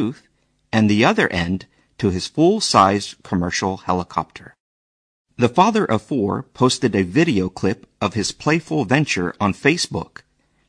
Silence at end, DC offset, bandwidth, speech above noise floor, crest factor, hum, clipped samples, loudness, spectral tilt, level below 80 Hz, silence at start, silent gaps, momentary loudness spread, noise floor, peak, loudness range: 0.65 s; under 0.1%; 10.5 kHz; over 71 dB; 18 dB; none; under 0.1%; -19 LUFS; -5 dB/octave; -50 dBFS; 0 s; 4.60-5.25 s; 10 LU; under -90 dBFS; -2 dBFS; 3 LU